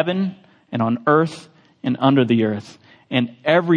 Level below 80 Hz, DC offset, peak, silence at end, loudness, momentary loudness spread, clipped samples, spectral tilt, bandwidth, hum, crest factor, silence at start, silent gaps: -66 dBFS; under 0.1%; -2 dBFS; 0 s; -20 LUFS; 12 LU; under 0.1%; -7.5 dB/octave; 9.8 kHz; none; 18 dB; 0 s; none